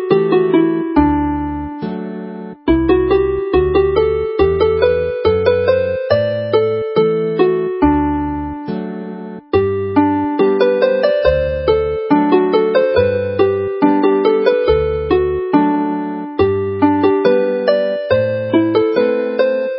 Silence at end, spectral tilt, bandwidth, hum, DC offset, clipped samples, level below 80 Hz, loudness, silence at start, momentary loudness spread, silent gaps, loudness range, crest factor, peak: 0 s; -11 dB/octave; 5.8 kHz; none; under 0.1%; under 0.1%; -32 dBFS; -15 LUFS; 0 s; 9 LU; none; 3 LU; 14 dB; 0 dBFS